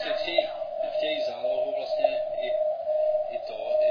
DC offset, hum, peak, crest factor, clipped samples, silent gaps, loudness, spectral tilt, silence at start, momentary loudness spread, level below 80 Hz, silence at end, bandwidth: under 0.1%; none; -8 dBFS; 18 dB; under 0.1%; none; -28 LUFS; -4 dB/octave; 0 s; 5 LU; -68 dBFS; 0 s; 5.4 kHz